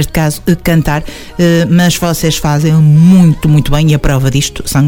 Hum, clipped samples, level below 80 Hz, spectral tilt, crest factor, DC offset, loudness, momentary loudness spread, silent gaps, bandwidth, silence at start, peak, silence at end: none; 1%; -24 dBFS; -6 dB/octave; 8 dB; 0.3%; -9 LUFS; 7 LU; none; 17.5 kHz; 0 s; 0 dBFS; 0 s